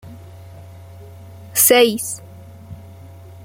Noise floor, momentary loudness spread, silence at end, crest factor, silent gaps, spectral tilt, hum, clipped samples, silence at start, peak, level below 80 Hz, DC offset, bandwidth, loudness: -39 dBFS; 28 LU; 0 s; 20 dB; none; -2 dB/octave; none; under 0.1%; 0.05 s; 0 dBFS; -56 dBFS; under 0.1%; 16.5 kHz; -14 LUFS